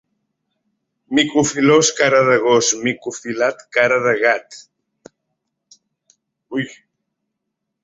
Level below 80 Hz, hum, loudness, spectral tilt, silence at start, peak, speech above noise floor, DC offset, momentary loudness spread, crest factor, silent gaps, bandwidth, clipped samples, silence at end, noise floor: -60 dBFS; none; -16 LUFS; -3 dB/octave; 1.1 s; -2 dBFS; 61 dB; under 0.1%; 12 LU; 18 dB; none; 8.2 kHz; under 0.1%; 1.1 s; -78 dBFS